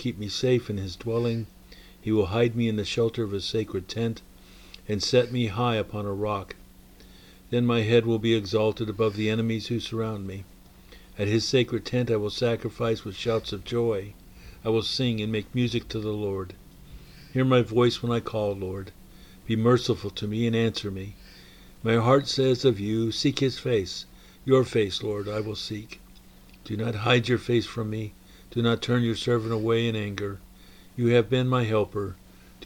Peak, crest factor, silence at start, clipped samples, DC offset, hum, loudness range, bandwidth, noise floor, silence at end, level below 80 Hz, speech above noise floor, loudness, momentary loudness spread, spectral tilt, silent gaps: -6 dBFS; 20 dB; 0 s; under 0.1%; under 0.1%; none; 3 LU; 17.5 kHz; -50 dBFS; 0 s; -52 dBFS; 25 dB; -26 LUFS; 13 LU; -6 dB/octave; none